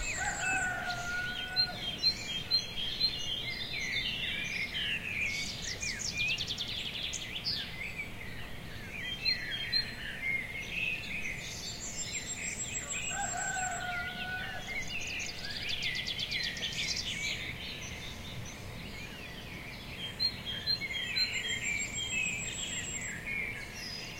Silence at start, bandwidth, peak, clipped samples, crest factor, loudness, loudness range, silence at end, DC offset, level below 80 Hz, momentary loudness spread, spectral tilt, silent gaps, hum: 0 s; 16 kHz; -18 dBFS; under 0.1%; 18 dB; -34 LUFS; 4 LU; 0 s; under 0.1%; -52 dBFS; 11 LU; -1 dB/octave; none; none